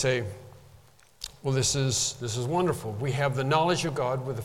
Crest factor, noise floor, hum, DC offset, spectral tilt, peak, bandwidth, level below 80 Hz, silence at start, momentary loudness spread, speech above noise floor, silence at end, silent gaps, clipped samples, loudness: 18 dB; -56 dBFS; none; under 0.1%; -4 dB/octave; -10 dBFS; 16 kHz; -54 dBFS; 0 s; 13 LU; 29 dB; 0 s; none; under 0.1%; -27 LUFS